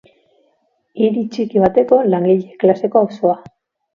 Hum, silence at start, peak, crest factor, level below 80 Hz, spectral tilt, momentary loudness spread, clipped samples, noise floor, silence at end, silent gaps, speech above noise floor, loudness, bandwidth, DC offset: none; 0.95 s; 0 dBFS; 16 dB; -54 dBFS; -9 dB/octave; 6 LU; under 0.1%; -63 dBFS; 0.55 s; none; 49 dB; -15 LUFS; 7 kHz; under 0.1%